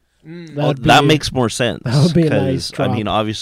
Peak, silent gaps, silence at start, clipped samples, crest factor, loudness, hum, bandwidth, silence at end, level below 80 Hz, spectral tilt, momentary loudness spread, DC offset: -2 dBFS; none; 0.25 s; under 0.1%; 14 dB; -15 LUFS; none; 15.5 kHz; 0 s; -42 dBFS; -5.5 dB/octave; 8 LU; under 0.1%